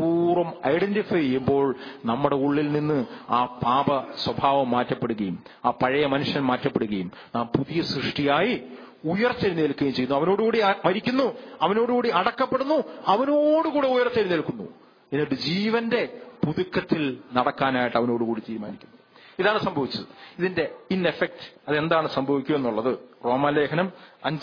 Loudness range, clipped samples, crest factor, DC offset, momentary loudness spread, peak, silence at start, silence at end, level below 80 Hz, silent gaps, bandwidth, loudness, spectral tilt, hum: 3 LU; under 0.1%; 18 dB; under 0.1%; 8 LU; -6 dBFS; 0 s; 0 s; -60 dBFS; none; 5.2 kHz; -24 LUFS; -7.5 dB/octave; none